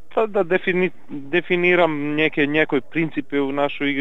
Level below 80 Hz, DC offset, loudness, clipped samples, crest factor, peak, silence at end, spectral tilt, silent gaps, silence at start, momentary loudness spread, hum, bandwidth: -66 dBFS; 2%; -20 LUFS; under 0.1%; 18 dB; -2 dBFS; 0 s; -7.5 dB/octave; none; 0.15 s; 7 LU; none; 5.8 kHz